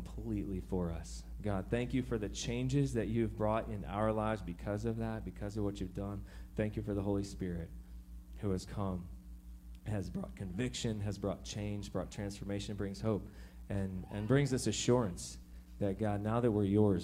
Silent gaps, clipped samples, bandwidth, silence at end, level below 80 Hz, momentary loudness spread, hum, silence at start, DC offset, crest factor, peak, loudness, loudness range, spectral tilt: none; under 0.1%; 15.5 kHz; 0 s; -50 dBFS; 15 LU; none; 0 s; under 0.1%; 20 dB; -16 dBFS; -37 LUFS; 5 LU; -6 dB/octave